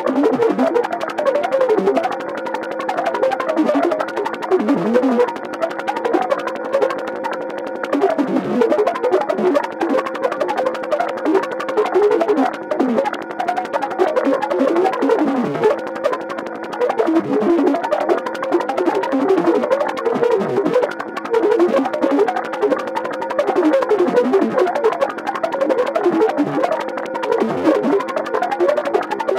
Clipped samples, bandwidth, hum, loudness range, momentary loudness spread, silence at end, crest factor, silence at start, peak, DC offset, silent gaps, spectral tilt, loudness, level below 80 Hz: under 0.1%; 15.5 kHz; none; 2 LU; 7 LU; 0 s; 16 dB; 0 s; -2 dBFS; under 0.1%; none; -6 dB/octave; -18 LUFS; -66 dBFS